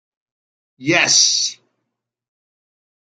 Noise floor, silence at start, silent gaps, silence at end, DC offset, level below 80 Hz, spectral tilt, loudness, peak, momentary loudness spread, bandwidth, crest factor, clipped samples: -78 dBFS; 0.8 s; none; 1.5 s; under 0.1%; -68 dBFS; -0.5 dB/octave; -13 LUFS; -2 dBFS; 12 LU; 12 kHz; 20 dB; under 0.1%